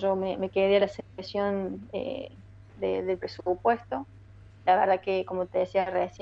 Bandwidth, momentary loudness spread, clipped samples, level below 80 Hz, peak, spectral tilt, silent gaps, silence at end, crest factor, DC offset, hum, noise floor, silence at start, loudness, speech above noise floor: 7.6 kHz; 13 LU; under 0.1%; -58 dBFS; -10 dBFS; -7 dB/octave; none; 0 s; 18 dB; under 0.1%; none; -50 dBFS; 0 s; -28 LUFS; 23 dB